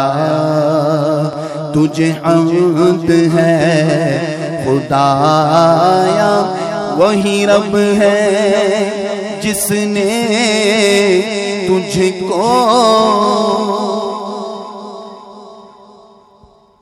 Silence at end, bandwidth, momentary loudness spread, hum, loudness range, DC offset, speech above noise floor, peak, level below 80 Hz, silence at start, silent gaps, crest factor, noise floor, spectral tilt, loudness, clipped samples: 1.2 s; 16 kHz; 9 LU; none; 3 LU; under 0.1%; 35 dB; 0 dBFS; -50 dBFS; 0 s; none; 12 dB; -46 dBFS; -5 dB/octave; -12 LUFS; under 0.1%